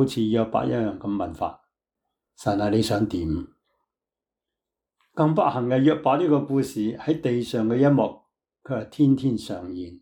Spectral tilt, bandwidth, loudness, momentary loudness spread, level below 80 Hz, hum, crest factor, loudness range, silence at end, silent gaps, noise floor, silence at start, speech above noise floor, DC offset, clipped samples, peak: -7.5 dB/octave; 18 kHz; -24 LUFS; 12 LU; -54 dBFS; none; 16 dB; 6 LU; 0.05 s; none; -89 dBFS; 0 s; 67 dB; under 0.1%; under 0.1%; -8 dBFS